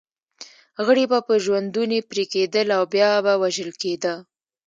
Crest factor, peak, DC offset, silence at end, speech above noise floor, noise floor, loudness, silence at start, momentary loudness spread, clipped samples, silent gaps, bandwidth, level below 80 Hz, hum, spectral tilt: 18 dB; -4 dBFS; under 0.1%; 0.45 s; 26 dB; -46 dBFS; -21 LUFS; 0.4 s; 9 LU; under 0.1%; none; 9 kHz; -74 dBFS; none; -4 dB/octave